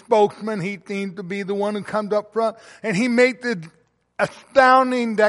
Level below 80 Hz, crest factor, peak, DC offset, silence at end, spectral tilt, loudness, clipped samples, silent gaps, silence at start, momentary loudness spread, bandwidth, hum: -64 dBFS; 18 dB; -2 dBFS; under 0.1%; 0 s; -5.5 dB/octave; -21 LUFS; under 0.1%; none; 0.1 s; 13 LU; 11.5 kHz; none